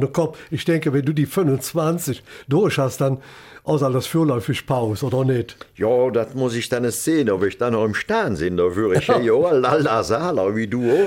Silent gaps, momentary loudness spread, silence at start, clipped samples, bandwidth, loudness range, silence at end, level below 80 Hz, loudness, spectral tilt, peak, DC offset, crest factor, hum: none; 6 LU; 0 s; under 0.1%; 17 kHz; 3 LU; 0 s; -52 dBFS; -20 LUFS; -6 dB/octave; -4 dBFS; under 0.1%; 14 dB; none